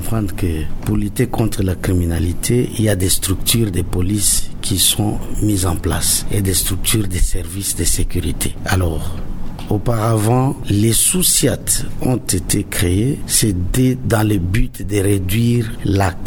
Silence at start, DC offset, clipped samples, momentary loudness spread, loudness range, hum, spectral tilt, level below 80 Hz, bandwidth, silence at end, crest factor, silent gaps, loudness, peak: 0 s; under 0.1%; under 0.1%; 8 LU; 3 LU; none; -4.5 dB/octave; -26 dBFS; 19.5 kHz; 0 s; 16 dB; none; -17 LUFS; 0 dBFS